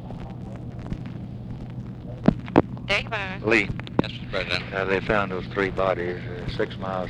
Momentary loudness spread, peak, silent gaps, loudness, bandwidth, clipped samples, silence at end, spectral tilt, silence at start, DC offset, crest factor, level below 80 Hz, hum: 15 LU; 0 dBFS; none; -26 LUFS; 11 kHz; under 0.1%; 0 s; -6.5 dB/octave; 0 s; under 0.1%; 26 dB; -42 dBFS; none